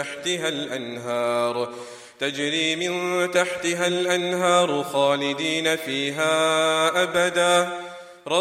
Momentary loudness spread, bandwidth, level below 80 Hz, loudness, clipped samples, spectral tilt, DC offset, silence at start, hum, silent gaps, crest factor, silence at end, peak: 10 LU; 16 kHz; -70 dBFS; -22 LUFS; under 0.1%; -3 dB/octave; under 0.1%; 0 s; none; none; 18 dB; 0 s; -4 dBFS